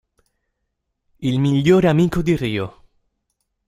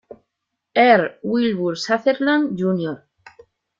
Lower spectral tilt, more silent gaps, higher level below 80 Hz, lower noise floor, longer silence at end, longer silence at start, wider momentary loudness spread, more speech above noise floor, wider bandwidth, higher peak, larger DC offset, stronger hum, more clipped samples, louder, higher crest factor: first, -7.5 dB/octave vs -6 dB/octave; neither; first, -44 dBFS vs -64 dBFS; second, -75 dBFS vs -79 dBFS; about the same, 0.95 s vs 0.85 s; first, 1.2 s vs 0.1 s; about the same, 12 LU vs 10 LU; about the same, 59 dB vs 61 dB; first, 15 kHz vs 7.6 kHz; about the same, -2 dBFS vs -2 dBFS; neither; neither; neither; about the same, -18 LUFS vs -19 LUFS; about the same, 18 dB vs 18 dB